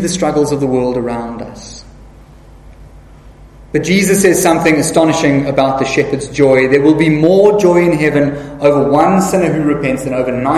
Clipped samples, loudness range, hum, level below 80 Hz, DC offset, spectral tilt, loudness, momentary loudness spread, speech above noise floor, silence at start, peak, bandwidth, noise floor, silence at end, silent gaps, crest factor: 0.3%; 9 LU; none; -38 dBFS; under 0.1%; -5.5 dB/octave; -12 LUFS; 9 LU; 26 dB; 0 s; 0 dBFS; 14 kHz; -38 dBFS; 0 s; none; 12 dB